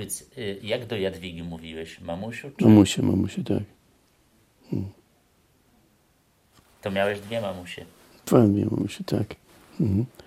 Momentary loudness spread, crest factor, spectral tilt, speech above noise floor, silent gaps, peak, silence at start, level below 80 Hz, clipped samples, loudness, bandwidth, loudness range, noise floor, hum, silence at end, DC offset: 19 LU; 24 dB; -6.5 dB/octave; 40 dB; none; -2 dBFS; 0 s; -60 dBFS; under 0.1%; -25 LUFS; 16 kHz; 12 LU; -64 dBFS; none; 0.2 s; under 0.1%